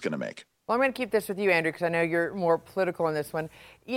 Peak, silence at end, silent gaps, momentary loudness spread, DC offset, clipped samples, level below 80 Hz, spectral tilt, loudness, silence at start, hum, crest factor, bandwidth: -10 dBFS; 0 s; none; 10 LU; under 0.1%; under 0.1%; -66 dBFS; -5.5 dB/octave; -27 LUFS; 0 s; none; 18 dB; 17 kHz